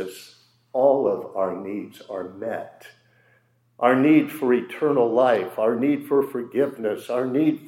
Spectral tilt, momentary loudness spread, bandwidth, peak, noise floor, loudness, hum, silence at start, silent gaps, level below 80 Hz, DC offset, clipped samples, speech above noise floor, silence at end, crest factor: -7 dB/octave; 15 LU; 16.5 kHz; -4 dBFS; -62 dBFS; -22 LUFS; none; 0 s; none; -80 dBFS; under 0.1%; under 0.1%; 41 dB; 0 s; 18 dB